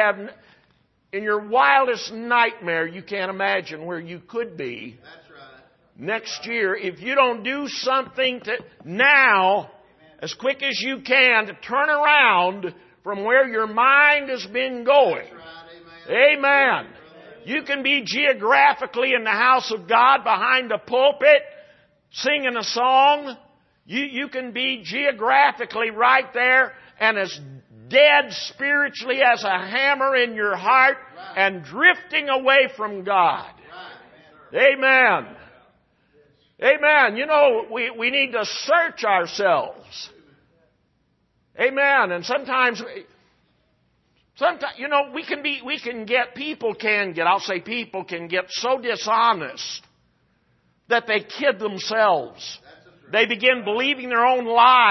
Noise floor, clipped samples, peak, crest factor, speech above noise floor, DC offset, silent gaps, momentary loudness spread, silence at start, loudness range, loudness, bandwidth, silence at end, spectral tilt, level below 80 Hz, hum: -67 dBFS; under 0.1%; -2 dBFS; 18 dB; 47 dB; under 0.1%; none; 15 LU; 0 s; 7 LU; -19 LUFS; 6.2 kHz; 0 s; -3 dB/octave; -70 dBFS; none